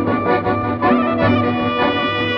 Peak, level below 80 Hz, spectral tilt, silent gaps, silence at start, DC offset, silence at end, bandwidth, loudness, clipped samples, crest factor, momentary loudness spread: -2 dBFS; -44 dBFS; -8.5 dB/octave; none; 0 s; under 0.1%; 0 s; 5.8 kHz; -17 LUFS; under 0.1%; 14 dB; 2 LU